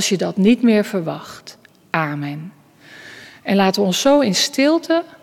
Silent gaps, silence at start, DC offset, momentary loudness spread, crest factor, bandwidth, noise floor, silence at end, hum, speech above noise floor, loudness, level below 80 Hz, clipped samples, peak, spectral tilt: none; 0 s; under 0.1%; 22 LU; 16 dB; 16.5 kHz; -43 dBFS; 0.05 s; none; 26 dB; -17 LUFS; -60 dBFS; under 0.1%; -4 dBFS; -4.5 dB/octave